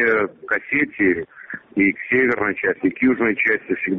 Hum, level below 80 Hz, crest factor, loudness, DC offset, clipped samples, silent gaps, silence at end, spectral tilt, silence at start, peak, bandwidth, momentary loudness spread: none; -56 dBFS; 14 dB; -19 LUFS; under 0.1%; under 0.1%; none; 0 s; -5 dB/octave; 0 s; -6 dBFS; 4.5 kHz; 7 LU